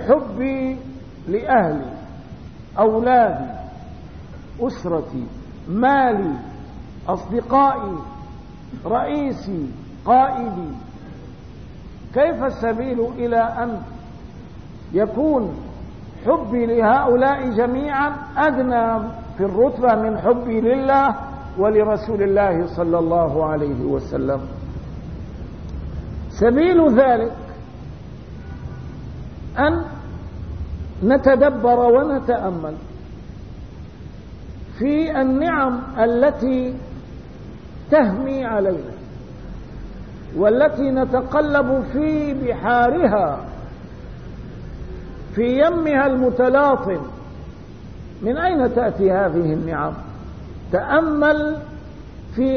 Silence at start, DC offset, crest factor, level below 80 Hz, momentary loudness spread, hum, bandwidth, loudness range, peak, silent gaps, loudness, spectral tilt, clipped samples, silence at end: 0 s; 0.5%; 18 dB; -38 dBFS; 22 LU; none; 6.4 kHz; 5 LU; -2 dBFS; none; -19 LUFS; -8.5 dB/octave; under 0.1%; 0 s